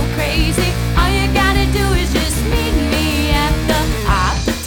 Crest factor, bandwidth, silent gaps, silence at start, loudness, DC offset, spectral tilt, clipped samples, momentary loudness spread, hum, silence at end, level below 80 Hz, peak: 14 dB; 19.5 kHz; none; 0 s; -16 LUFS; under 0.1%; -4.5 dB/octave; under 0.1%; 3 LU; none; 0 s; -20 dBFS; -2 dBFS